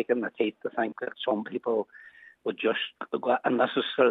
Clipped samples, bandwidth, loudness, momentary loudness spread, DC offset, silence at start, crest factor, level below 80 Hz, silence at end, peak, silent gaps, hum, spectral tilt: under 0.1%; 4.5 kHz; -29 LUFS; 9 LU; under 0.1%; 0 s; 20 dB; -84 dBFS; 0 s; -8 dBFS; none; none; -7 dB/octave